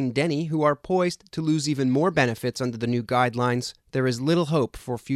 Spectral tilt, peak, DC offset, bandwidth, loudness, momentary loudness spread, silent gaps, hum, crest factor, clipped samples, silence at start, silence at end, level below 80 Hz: -6 dB/octave; -6 dBFS; under 0.1%; 14 kHz; -24 LUFS; 6 LU; none; none; 18 dB; under 0.1%; 0 s; 0 s; -56 dBFS